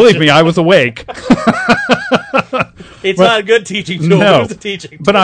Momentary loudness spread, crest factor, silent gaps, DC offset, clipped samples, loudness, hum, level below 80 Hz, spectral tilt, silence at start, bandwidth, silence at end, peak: 11 LU; 10 dB; none; under 0.1%; 2%; -11 LUFS; none; -42 dBFS; -5.5 dB/octave; 0 s; 11 kHz; 0 s; 0 dBFS